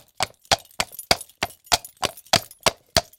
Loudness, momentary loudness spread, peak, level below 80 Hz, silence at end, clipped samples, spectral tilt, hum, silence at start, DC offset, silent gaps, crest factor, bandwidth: -24 LUFS; 8 LU; 0 dBFS; -48 dBFS; 0.15 s; under 0.1%; -1.5 dB/octave; none; 0.2 s; under 0.1%; none; 26 dB; 17 kHz